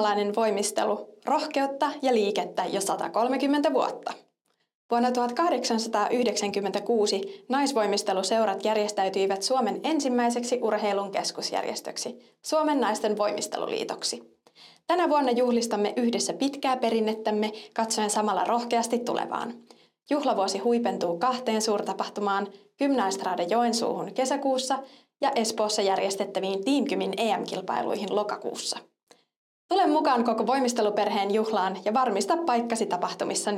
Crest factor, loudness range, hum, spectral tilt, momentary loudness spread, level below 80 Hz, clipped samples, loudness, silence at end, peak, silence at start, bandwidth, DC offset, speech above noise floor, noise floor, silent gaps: 16 dB; 2 LU; none; -3.5 dB/octave; 6 LU; -80 dBFS; under 0.1%; -26 LUFS; 0 s; -12 dBFS; 0 s; 16 kHz; under 0.1%; 48 dB; -74 dBFS; 4.75-4.89 s, 29.03-29.07 s, 29.36-29.69 s